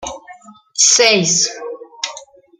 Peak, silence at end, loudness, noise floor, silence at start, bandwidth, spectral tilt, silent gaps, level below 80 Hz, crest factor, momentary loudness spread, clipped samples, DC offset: 0 dBFS; 0.35 s; -11 LUFS; -41 dBFS; 0 s; 15.5 kHz; -1 dB/octave; none; -56 dBFS; 18 dB; 21 LU; under 0.1%; under 0.1%